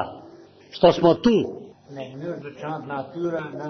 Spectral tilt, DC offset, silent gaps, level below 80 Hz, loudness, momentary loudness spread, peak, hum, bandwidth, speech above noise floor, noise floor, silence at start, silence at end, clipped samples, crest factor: -7 dB/octave; under 0.1%; none; -54 dBFS; -23 LUFS; 23 LU; -4 dBFS; none; 6.4 kHz; 25 dB; -47 dBFS; 0 s; 0 s; under 0.1%; 20 dB